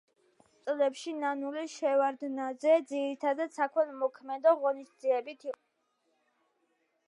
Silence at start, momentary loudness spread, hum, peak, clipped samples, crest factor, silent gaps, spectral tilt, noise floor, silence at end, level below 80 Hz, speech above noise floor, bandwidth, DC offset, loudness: 0.65 s; 10 LU; none; -14 dBFS; under 0.1%; 18 dB; none; -3 dB/octave; -77 dBFS; 1.55 s; under -90 dBFS; 47 dB; 11 kHz; under 0.1%; -31 LUFS